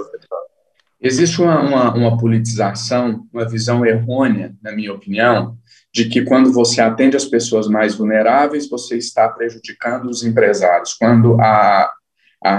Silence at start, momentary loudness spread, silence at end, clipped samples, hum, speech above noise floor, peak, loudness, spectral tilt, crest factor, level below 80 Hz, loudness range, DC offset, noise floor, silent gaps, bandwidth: 0 s; 12 LU; 0 s; under 0.1%; none; 47 dB; 0 dBFS; -15 LUFS; -5.5 dB/octave; 14 dB; -60 dBFS; 3 LU; under 0.1%; -61 dBFS; none; 10.5 kHz